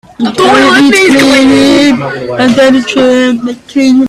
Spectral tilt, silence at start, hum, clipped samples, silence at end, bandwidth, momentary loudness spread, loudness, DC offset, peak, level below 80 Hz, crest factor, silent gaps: -4 dB/octave; 0.2 s; none; 0.4%; 0 s; 13.5 kHz; 9 LU; -6 LUFS; under 0.1%; 0 dBFS; -40 dBFS; 6 dB; none